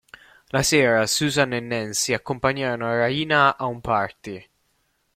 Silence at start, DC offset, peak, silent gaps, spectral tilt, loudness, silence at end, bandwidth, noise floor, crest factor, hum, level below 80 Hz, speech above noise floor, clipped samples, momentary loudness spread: 0.55 s; under 0.1%; -4 dBFS; none; -3.5 dB/octave; -21 LUFS; 0.75 s; 16.5 kHz; -69 dBFS; 20 dB; none; -52 dBFS; 47 dB; under 0.1%; 10 LU